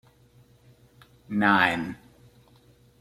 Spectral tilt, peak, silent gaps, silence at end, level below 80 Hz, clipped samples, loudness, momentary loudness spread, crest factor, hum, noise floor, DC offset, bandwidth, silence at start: -5.5 dB/octave; -6 dBFS; none; 1.05 s; -62 dBFS; under 0.1%; -24 LUFS; 18 LU; 24 dB; none; -58 dBFS; under 0.1%; 13.5 kHz; 1.3 s